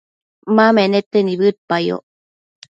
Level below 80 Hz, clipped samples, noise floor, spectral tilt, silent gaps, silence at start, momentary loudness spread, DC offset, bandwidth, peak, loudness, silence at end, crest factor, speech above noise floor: -66 dBFS; under 0.1%; under -90 dBFS; -7 dB/octave; 1.06-1.11 s, 1.58-1.68 s; 0.45 s; 11 LU; under 0.1%; 7.6 kHz; 0 dBFS; -16 LUFS; 0.75 s; 16 dB; over 75 dB